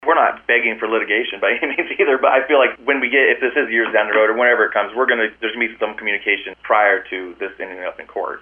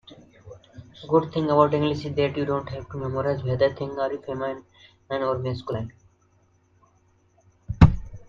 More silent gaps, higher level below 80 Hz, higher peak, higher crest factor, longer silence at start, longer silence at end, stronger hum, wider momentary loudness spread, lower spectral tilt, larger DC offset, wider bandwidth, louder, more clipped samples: neither; second, -60 dBFS vs -38 dBFS; about the same, 0 dBFS vs 0 dBFS; second, 18 dB vs 24 dB; about the same, 0 s vs 0.1 s; about the same, 0 s vs 0.05 s; neither; second, 13 LU vs 17 LU; second, -5.5 dB/octave vs -8.5 dB/octave; neither; second, 3.6 kHz vs 7.2 kHz; first, -17 LUFS vs -24 LUFS; neither